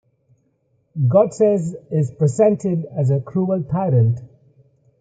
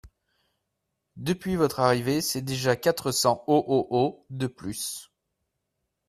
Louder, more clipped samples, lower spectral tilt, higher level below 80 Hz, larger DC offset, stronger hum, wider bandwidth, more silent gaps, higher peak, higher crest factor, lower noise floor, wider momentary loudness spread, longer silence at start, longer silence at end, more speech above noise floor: first, -19 LUFS vs -26 LUFS; neither; first, -9.5 dB/octave vs -4.5 dB/octave; about the same, -58 dBFS vs -58 dBFS; neither; neither; second, 9.2 kHz vs 15.5 kHz; neither; about the same, -4 dBFS vs -6 dBFS; second, 16 dB vs 22 dB; second, -64 dBFS vs -81 dBFS; second, 7 LU vs 10 LU; first, 0.95 s vs 0.05 s; second, 0.75 s vs 1.05 s; second, 47 dB vs 55 dB